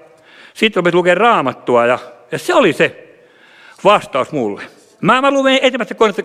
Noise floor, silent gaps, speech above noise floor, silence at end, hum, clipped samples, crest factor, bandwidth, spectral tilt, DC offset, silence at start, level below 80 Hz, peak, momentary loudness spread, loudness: -45 dBFS; none; 32 dB; 0 s; none; under 0.1%; 14 dB; 14.5 kHz; -5 dB/octave; under 0.1%; 0.55 s; -58 dBFS; 0 dBFS; 9 LU; -14 LUFS